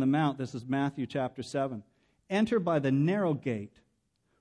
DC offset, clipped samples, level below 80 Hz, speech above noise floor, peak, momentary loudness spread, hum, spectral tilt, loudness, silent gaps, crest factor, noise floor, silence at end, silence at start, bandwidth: under 0.1%; under 0.1%; -70 dBFS; 45 dB; -16 dBFS; 10 LU; none; -7.5 dB/octave; -31 LUFS; none; 14 dB; -75 dBFS; 0.75 s; 0 s; 10.5 kHz